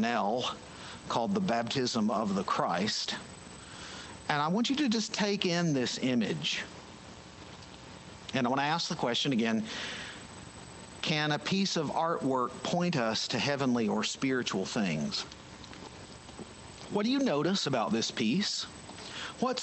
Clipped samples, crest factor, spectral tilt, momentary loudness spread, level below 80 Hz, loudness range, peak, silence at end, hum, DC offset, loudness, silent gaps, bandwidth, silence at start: under 0.1%; 20 dB; -4.5 dB/octave; 18 LU; -64 dBFS; 3 LU; -12 dBFS; 0 s; none; under 0.1%; -31 LUFS; none; 8.8 kHz; 0 s